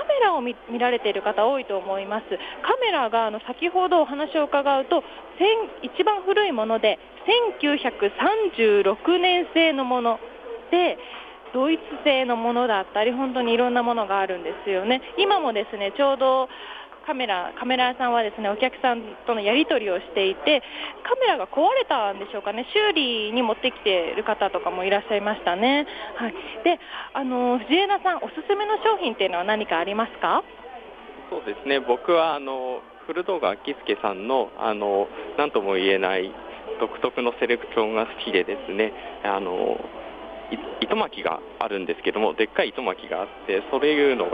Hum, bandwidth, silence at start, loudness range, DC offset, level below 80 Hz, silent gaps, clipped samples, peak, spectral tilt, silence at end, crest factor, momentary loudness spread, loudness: none; 5 kHz; 0 s; 4 LU; under 0.1%; -60 dBFS; none; under 0.1%; -6 dBFS; -6 dB/octave; 0 s; 16 dB; 10 LU; -23 LUFS